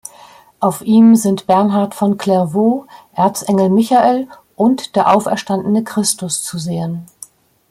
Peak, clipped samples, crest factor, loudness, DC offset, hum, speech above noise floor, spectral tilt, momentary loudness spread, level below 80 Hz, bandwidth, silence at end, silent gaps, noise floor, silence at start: 0 dBFS; under 0.1%; 14 dB; -14 LUFS; under 0.1%; none; 29 dB; -5.5 dB/octave; 11 LU; -58 dBFS; 16 kHz; 0.65 s; none; -43 dBFS; 0.6 s